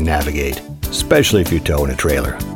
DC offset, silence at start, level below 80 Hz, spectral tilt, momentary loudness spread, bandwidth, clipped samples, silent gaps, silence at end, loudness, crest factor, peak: under 0.1%; 0 s; -24 dBFS; -4.5 dB/octave; 10 LU; 19 kHz; under 0.1%; none; 0 s; -17 LUFS; 16 dB; 0 dBFS